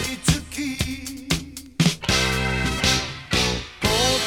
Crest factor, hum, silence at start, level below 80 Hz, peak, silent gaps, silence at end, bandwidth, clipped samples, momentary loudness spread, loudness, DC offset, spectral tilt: 20 dB; none; 0 s; -34 dBFS; -4 dBFS; none; 0 s; 18.5 kHz; under 0.1%; 8 LU; -22 LUFS; under 0.1%; -3.5 dB/octave